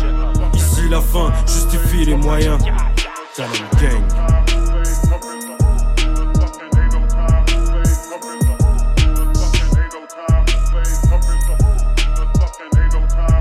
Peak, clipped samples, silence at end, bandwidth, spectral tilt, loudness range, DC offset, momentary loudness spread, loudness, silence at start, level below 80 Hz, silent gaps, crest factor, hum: -2 dBFS; under 0.1%; 0 s; 15 kHz; -5 dB/octave; 1 LU; under 0.1%; 4 LU; -17 LUFS; 0 s; -14 dBFS; none; 12 dB; none